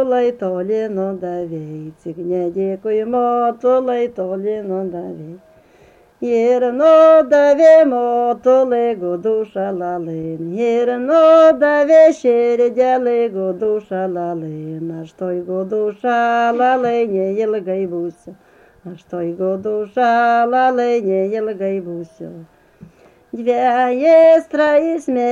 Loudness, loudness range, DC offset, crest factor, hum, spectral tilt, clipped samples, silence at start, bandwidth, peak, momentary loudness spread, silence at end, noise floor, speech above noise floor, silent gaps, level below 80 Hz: -15 LUFS; 8 LU; under 0.1%; 14 dB; none; -6.5 dB/octave; under 0.1%; 0 s; 7.6 kHz; -2 dBFS; 17 LU; 0 s; -49 dBFS; 34 dB; none; -60 dBFS